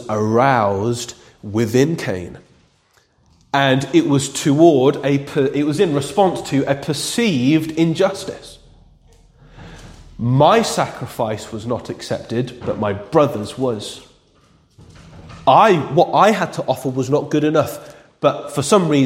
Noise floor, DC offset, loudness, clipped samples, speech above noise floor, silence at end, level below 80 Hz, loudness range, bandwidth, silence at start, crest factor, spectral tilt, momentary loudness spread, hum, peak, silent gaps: -58 dBFS; under 0.1%; -17 LUFS; under 0.1%; 41 dB; 0 s; -52 dBFS; 6 LU; 16.5 kHz; 0 s; 18 dB; -5.5 dB/octave; 13 LU; none; 0 dBFS; none